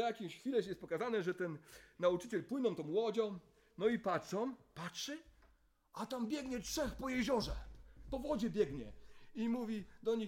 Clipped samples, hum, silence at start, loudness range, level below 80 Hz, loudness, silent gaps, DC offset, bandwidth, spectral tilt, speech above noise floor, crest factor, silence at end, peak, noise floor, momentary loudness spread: under 0.1%; none; 0 s; 3 LU; -58 dBFS; -40 LUFS; none; under 0.1%; 16.5 kHz; -5 dB/octave; 32 dB; 18 dB; 0 s; -22 dBFS; -71 dBFS; 14 LU